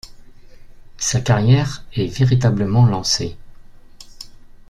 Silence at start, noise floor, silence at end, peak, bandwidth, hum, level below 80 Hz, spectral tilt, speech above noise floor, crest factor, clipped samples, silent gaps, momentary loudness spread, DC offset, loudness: 0.05 s; -39 dBFS; 0.15 s; -2 dBFS; 12 kHz; none; -40 dBFS; -5 dB/octave; 23 dB; 16 dB; under 0.1%; none; 23 LU; under 0.1%; -17 LUFS